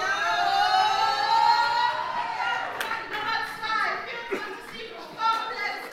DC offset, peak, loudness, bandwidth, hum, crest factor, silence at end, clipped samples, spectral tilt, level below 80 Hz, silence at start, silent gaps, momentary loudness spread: under 0.1%; -10 dBFS; -25 LUFS; 16 kHz; none; 16 dB; 0 s; under 0.1%; -1.5 dB/octave; -62 dBFS; 0 s; none; 11 LU